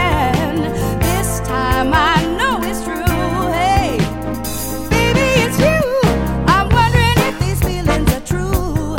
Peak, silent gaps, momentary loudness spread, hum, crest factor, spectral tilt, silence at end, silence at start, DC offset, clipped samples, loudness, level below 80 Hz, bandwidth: 0 dBFS; none; 7 LU; none; 14 dB; -5 dB/octave; 0 s; 0 s; under 0.1%; under 0.1%; -16 LUFS; -24 dBFS; 17 kHz